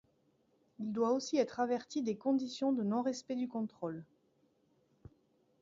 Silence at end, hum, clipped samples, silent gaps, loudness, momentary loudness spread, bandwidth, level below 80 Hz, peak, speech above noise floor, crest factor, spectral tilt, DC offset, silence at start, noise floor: 1.55 s; none; under 0.1%; none; -36 LUFS; 9 LU; 7.4 kHz; -76 dBFS; -18 dBFS; 39 dB; 18 dB; -5.5 dB/octave; under 0.1%; 0.8 s; -74 dBFS